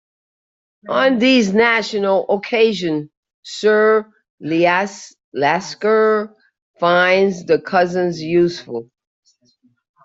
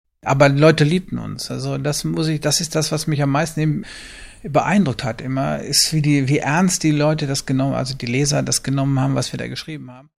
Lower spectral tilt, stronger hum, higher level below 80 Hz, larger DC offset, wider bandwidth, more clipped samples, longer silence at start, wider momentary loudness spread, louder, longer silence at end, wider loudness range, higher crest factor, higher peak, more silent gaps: about the same, -5 dB/octave vs -4.5 dB/octave; neither; second, -62 dBFS vs -46 dBFS; neither; second, 7.8 kHz vs 14.5 kHz; neither; first, 0.85 s vs 0.25 s; about the same, 14 LU vs 12 LU; first, -16 LUFS vs -19 LUFS; first, 1.2 s vs 0.2 s; about the same, 2 LU vs 3 LU; about the same, 16 dB vs 18 dB; about the same, -2 dBFS vs 0 dBFS; first, 3.17-3.23 s, 3.34-3.43 s, 4.30-4.38 s, 5.24-5.32 s, 6.62-6.74 s vs none